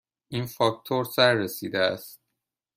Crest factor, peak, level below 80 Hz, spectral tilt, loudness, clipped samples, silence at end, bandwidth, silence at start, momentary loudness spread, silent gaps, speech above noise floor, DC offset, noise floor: 22 dB; -6 dBFS; -68 dBFS; -4.5 dB/octave; -25 LUFS; under 0.1%; 0.6 s; 16 kHz; 0.3 s; 14 LU; none; 58 dB; under 0.1%; -83 dBFS